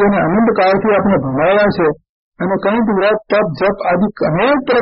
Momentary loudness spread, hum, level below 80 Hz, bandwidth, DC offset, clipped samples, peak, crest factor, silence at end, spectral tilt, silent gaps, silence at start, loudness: 5 LU; none; -42 dBFS; 5.8 kHz; under 0.1%; under 0.1%; -4 dBFS; 10 dB; 0 s; -5.5 dB/octave; 2.09-2.32 s; 0 s; -14 LUFS